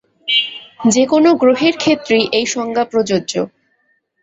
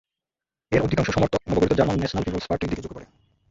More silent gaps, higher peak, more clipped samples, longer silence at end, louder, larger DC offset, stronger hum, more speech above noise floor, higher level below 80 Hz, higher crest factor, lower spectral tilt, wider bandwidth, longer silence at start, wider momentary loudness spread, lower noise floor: neither; about the same, -2 dBFS vs -4 dBFS; neither; first, 0.75 s vs 0.45 s; first, -15 LUFS vs -23 LUFS; neither; neither; second, 48 dB vs 67 dB; second, -58 dBFS vs -42 dBFS; second, 14 dB vs 20 dB; second, -3.5 dB/octave vs -6.5 dB/octave; about the same, 8 kHz vs 7.8 kHz; second, 0.25 s vs 0.7 s; about the same, 9 LU vs 10 LU; second, -62 dBFS vs -90 dBFS